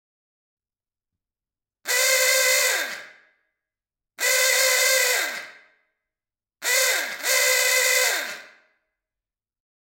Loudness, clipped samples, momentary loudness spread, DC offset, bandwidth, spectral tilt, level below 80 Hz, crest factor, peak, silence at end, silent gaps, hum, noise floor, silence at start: -19 LUFS; under 0.1%; 14 LU; under 0.1%; 17 kHz; 4 dB/octave; -86 dBFS; 18 dB; -6 dBFS; 1.45 s; none; none; under -90 dBFS; 1.85 s